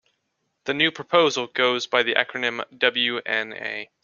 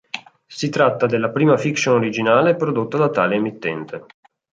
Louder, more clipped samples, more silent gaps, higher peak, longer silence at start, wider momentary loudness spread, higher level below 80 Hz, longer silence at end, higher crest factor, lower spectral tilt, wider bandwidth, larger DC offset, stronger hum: second, -22 LUFS vs -18 LUFS; neither; neither; about the same, 0 dBFS vs -2 dBFS; first, 0.65 s vs 0.15 s; second, 10 LU vs 17 LU; second, -70 dBFS vs -64 dBFS; second, 0.2 s vs 0.55 s; first, 24 dB vs 16 dB; second, -3 dB/octave vs -6 dB/octave; second, 7.2 kHz vs 9 kHz; neither; neither